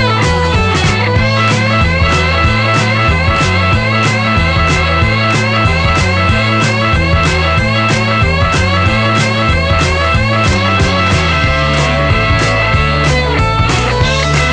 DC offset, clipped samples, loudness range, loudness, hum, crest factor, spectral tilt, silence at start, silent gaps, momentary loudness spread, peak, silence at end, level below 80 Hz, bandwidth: under 0.1%; under 0.1%; 0 LU; -11 LUFS; none; 10 dB; -5 dB/octave; 0 s; none; 1 LU; 0 dBFS; 0 s; -20 dBFS; 10 kHz